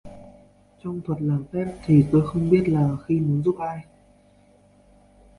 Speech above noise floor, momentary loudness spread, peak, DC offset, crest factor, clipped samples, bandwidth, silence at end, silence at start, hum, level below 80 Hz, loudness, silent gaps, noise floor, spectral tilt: 35 dB; 14 LU; -6 dBFS; under 0.1%; 18 dB; under 0.1%; 11 kHz; 1.55 s; 0.05 s; none; -50 dBFS; -22 LUFS; none; -56 dBFS; -10 dB/octave